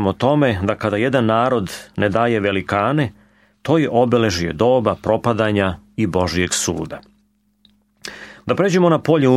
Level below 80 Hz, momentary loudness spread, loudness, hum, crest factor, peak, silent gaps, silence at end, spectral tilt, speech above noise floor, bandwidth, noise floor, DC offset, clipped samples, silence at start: -46 dBFS; 12 LU; -18 LUFS; none; 16 dB; -2 dBFS; none; 0 s; -5.5 dB/octave; 44 dB; 15 kHz; -61 dBFS; under 0.1%; under 0.1%; 0 s